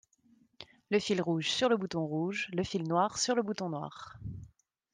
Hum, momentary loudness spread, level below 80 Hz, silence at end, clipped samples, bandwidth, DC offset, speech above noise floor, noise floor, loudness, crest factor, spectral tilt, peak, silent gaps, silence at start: none; 16 LU; -64 dBFS; 0.45 s; under 0.1%; 10 kHz; under 0.1%; 35 dB; -67 dBFS; -32 LUFS; 18 dB; -4.5 dB/octave; -16 dBFS; none; 0.6 s